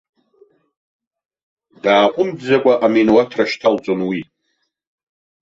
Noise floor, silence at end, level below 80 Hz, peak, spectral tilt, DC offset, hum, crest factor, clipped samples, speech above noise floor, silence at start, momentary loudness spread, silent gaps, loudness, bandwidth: -70 dBFS; 1.2 s; -60 dBFS; -2 dBFS; -6 dB/octave; under 0.1%; none; 16 dB; under 0.1%; 55 dB; 1.85 s; 8 LU; none; -16 LUFS; 7.8 kHz